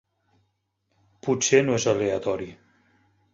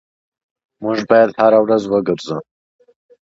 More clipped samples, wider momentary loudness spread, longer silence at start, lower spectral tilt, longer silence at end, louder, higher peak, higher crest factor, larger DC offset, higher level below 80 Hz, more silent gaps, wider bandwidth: neither; about the same, 13 LU vs 15 LU; first, 1.25 s vs 0.8 s; second, -4 dB/octave vs -6.5 dB/octave; about the same, 0.8 s vs 0.9 s; second, -23 LUFS vs -15 LUFS; second, -4 dBFS vs 0 dBFS; first, 22 dB vs 16 dB; neither; about the same, -60 dBFS vs -60 dBFS; neither; about the same, 7.8 kHz vs 7.8 kHz